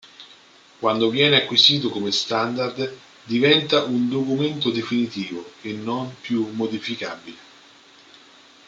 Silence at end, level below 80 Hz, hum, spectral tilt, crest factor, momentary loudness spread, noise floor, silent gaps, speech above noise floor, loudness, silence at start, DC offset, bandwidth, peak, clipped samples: 1.25 s; -68 dBFS; none; -4.5 dB/octave; 20 dB; 15 LU; -50 dBFS; none; 29 dB; -21 LUFS; 0.05 s; under 0.1%; 7.8 kHz; -2 dBFS; under 0.1%